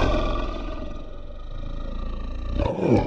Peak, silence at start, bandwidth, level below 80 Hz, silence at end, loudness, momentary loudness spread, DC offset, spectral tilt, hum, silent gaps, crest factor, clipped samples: -6 dBFS; 0 s; 7.4 kHz; -28 dBFS; 0 s; -29 LUFS; 16 LU; under 0.1%; -7.5 dB/octave; none; none; 20 dB; under 0.1%